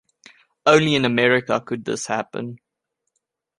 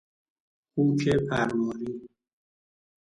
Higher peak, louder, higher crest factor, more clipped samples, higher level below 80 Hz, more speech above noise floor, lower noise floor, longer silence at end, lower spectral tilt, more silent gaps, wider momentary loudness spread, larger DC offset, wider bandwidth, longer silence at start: first, -2 dBFS vs -12 dBFS; first, -19 LUFS vs -27 LUFS; about the same, 20 dB vs 16 dB; neither; second, -62 dBFS vs -54 dBFS; second, 59 dB vs over 64 dB; second, -79 dBFS vs under -90 dBFS; about the same, 1 s vs 1 s; second, -4.5 dB/octave vs -7 dB/octave; neither; about the same, 14 LU vs 12 LU; neither; about the same, 11.5 kHz vs 11 kHz; about the same, 0.65 s vs 0.75 s